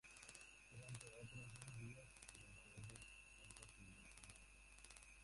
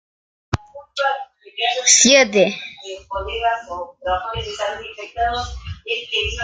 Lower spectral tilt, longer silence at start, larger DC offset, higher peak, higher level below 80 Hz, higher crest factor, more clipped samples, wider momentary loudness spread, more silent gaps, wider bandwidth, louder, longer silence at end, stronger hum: first, -3.5 dB/octave vs -1.5 dB/octave; second, 0.05 s vs 0.5 s; neither; second, -34 dBFS vs 0 dBFS; second, -70 dBFS vs -40 dBFS; first, 26 dB vs 20 dB; neither; second, 6 LU vs 20 LU; neither; about the same, 11.5 kHz vs 11 kHz; second, -59 LUFS vs -18 LUFS; about the same, 0 s vs 0 s; neither